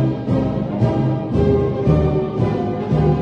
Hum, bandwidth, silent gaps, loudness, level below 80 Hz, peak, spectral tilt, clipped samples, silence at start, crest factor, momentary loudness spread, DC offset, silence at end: none; 6.4 kHz; none; -18 LUFS; -30 dBFS; -2 dBFS; -10 dB/octave; under 0.1%; 0 s; 14 dB; 3 LU; under 0.1%; 0 s